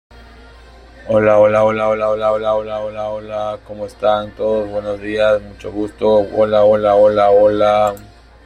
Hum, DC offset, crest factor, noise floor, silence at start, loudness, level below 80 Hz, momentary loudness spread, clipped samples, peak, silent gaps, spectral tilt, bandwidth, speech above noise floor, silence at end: none; under 0.1%; 14 dB; -40 dBFS; 1 s; -15 LUFS; -44 dBFS; 13 LU; under 0.1%; -2 dBFS; none; -6.5 dB/octave; 9.6 kHz; 26 dB; 0.4 s